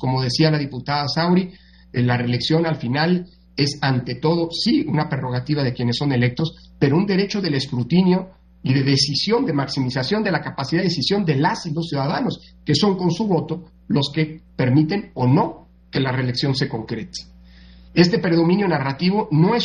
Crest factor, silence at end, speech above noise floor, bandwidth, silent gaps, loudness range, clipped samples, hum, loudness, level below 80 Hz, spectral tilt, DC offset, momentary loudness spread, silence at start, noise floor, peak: 18 dB; 0 s; 25 dB; 10.5 kHz; none; 2 LU; under 0.1%; none; -20 LUFS; -50 dBFS; -6 dB/octave; under 0.1%; 8 LU; 0 s; -45 dBFS; -2 dBFS